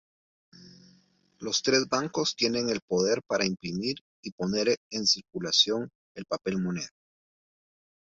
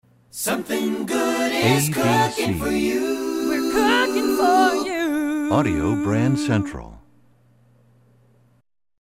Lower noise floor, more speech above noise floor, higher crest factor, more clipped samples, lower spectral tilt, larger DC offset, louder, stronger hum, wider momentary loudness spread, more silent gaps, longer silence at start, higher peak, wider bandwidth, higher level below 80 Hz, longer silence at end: first, -64 dBFS vs -58 dBFS; about the same, 36 dB vs 38 dB; first, 22 dB vs 16 dB; neither; second, -3 dB/octave vs -5 dB/octave; second, under 0.1% vs 0.1%; second, -27 LUFS vs -20 LUFS; neither; first, 13 LU vs 6 LU; first, 2.82-2.88 s, 4.01-4.23 s, 4.32-4.38 s, 4.77-4.90 s, 5.95-6.15 s vs none; first, 0.6 s vs 0.35 s; second, -8 dBFS vs -4 dBFS; second, 7.8 kHz vs 16 kHz; second, -66 dBFS vs -46 dBFS; second, 1.2 s vs 2 s